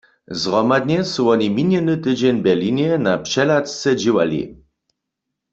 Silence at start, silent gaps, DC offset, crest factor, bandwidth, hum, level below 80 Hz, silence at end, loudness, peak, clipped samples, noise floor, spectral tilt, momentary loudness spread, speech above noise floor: 0.3 s; none; under 0.1%; 16 dB; 8 kHz; none; -56 dBFS; 1 s; -18 LUFS; -2 dBFS; under 0.1%; -80 dBFS; -5.5 dB/octave; 4 LU; 62 dB